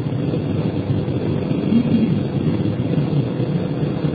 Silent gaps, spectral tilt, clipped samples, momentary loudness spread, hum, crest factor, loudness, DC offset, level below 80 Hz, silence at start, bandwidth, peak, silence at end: none; -11 dB/octave; under 0.1%; 4 LU; none; 14 dB; -20 LUFS; under 0.1%; -44 dBFS; 0 s; 4.9 kHz; -6 dBFS; 0 s